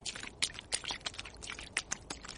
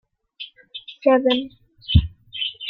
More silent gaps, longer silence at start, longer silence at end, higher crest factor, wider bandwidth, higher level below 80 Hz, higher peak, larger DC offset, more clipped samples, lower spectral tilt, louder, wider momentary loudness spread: neither; second, 0 s vs 0.4 s; about the same, 0 s vs 0 s; first, 30 dB vs 20 dB; first, 11 kHz vs 5.2 kHz; second, -58 dBFS vs -34 dBFS; second, -12 dBFS vs -2 dBFS; neither; neither; second, -0.5 dB/octave vs -8.5 dB/octave; second, -38 LUFS vs -20 LUFS; second, 8 LU vs 20 LU